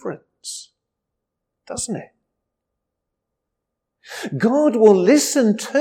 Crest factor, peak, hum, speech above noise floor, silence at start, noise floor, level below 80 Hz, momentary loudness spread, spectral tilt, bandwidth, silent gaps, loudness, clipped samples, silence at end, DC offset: 18 dB; -2 dBFS; none; 64 dB; 0.05 s; -80 dBFS; -64 dBFS; 19 LU; -4.5 dB/octave; 16.5 kHz; none; -17 LUFS; under 0.1%; 0 s; under 0.1%